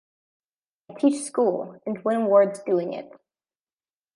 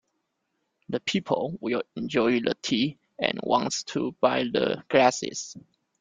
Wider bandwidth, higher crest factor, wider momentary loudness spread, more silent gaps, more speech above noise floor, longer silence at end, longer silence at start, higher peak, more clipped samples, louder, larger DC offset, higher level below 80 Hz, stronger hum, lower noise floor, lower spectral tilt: first, 11.5 kHz vs 9.4 kHz; about the same, 20 dB vs 22 dB; first, 13 LU vs 9 LU; neither; first, over 67 dB vs 52 dB; first, 1.1 s vs 0.4 s; about the same, 0.9 s vs 0.9 s; about the same, -6 dBFS vs -4 dBFS; neither; first, -23 LUFS vs -26 LUFS; neither; second, -80 dBFS vs -66 dBFS; neither; first, under -90 dBFS vs -78 dBFS; first, -6 dB/octave vs -4 dB/octave